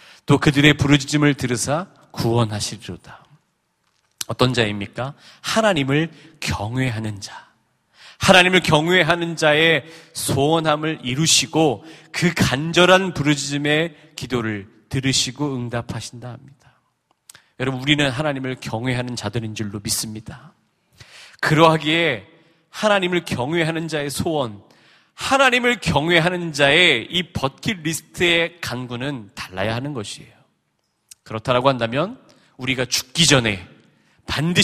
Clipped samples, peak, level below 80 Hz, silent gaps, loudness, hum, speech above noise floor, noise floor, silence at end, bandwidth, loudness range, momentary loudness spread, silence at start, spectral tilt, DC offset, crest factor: under 0.1%; 0 dBFS; -48 dBFS; none; -19 LUFS; none; 50 dB; -70 dBFS; 0 s; 15.5 kHz; 8 LU; 16 LU; 0.3 s; -4 dB/octave; under 0.1%; 20 dB